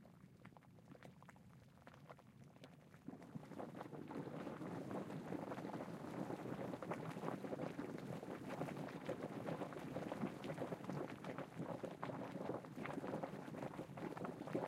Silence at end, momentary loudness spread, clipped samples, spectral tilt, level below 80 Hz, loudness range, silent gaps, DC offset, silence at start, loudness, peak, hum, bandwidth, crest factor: 0 s; 15 LU; under 0.1%; -7 dB/octave; -80 dBFS; 8 LU; none; under 0.1%; 0 s; -49 LUFS; -28 dBFS; none; 16 kHz; 20 dB